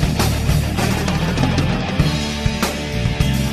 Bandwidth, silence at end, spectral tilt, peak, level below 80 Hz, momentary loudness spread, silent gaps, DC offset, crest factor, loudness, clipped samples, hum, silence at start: 14 kHz; 0 s; -5.5 dB/octave; -2 dBFS; -24 dBFS; 3 LU; none; under 0.1%; 16 dB; -19 LUFS; under 0.1%; none; 0 s